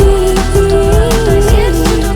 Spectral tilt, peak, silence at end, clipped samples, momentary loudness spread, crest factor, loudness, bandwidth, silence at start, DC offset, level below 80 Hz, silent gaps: -5.5 dB/octave; 0 dBFS; 0 s; under 0.1%; 2 LU; 8 dB; -10 LUFS; 18.5 kHz; 0 s; under 0.1%; -12 dBFS; none